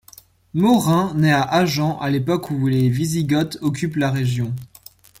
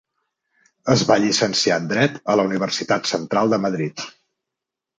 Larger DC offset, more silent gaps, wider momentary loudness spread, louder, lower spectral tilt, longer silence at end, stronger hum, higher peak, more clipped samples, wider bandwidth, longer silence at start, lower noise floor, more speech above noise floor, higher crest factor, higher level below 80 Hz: neither; neither; second, 7 LU vs 10 LU; about the same, -19 LUFS vs -19 LUFS; first, -6 dB/octave vs -4 dB/octave; second, 0.55 s vs 0.9 s; neither; about the same, -4 dBFS vs -2 dBFS; neither; first, 16.5 kHz vs 9.6 kHz; second, 0.55 s vs 0.85 s; second, -48 dBFS vs -85 dBFS; second, 30 dB vs 66 dB; second, 14 dB vs 20 dB; first, -52 dBFS vs -60 dBFS